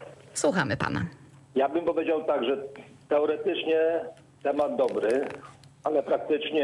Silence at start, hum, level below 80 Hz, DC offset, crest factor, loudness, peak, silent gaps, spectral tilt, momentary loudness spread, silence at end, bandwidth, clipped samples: 0 s; none; -64 dBFS; under 0.1%; 14 dB; -27 LUFS; -14 dBFS; none; -5 dB/octave; 11 LU; 0 s; 11.5 kHz; under 0.1%